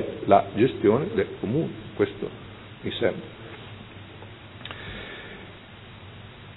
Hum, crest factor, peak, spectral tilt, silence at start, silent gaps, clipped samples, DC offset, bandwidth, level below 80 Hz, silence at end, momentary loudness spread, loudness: none; 24 dB; -4 dBFS; -10.5 dB/octave; 0 s; none; under 0.1%; under 0.1%; 4.1 kHz; -56 dBFS; 0 s; 23 LU; -26 LUFS